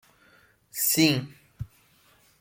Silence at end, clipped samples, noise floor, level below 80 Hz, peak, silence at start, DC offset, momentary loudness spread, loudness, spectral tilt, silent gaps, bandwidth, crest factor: 0.75 s; under 0.1%; -61 dBFS; -58 dBFS; -8 dBFS; 0.75 s; under 0.1%; 22 LU; -23 LUFS; -3.5 dB/octave; none; 17 kHz; 22 dB